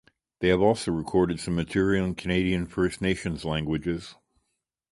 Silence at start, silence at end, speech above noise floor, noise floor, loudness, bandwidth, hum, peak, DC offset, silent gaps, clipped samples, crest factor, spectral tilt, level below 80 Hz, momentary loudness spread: 0.4 s; 0.8 s; 54 dB; -79 dBFS; -26 LUFS; 11.5 kHz; none; -8 dBFS; under 0.1%; none; under 0.1%; 20 dB; -6 dB/octave; -46 dBFS; 7 LU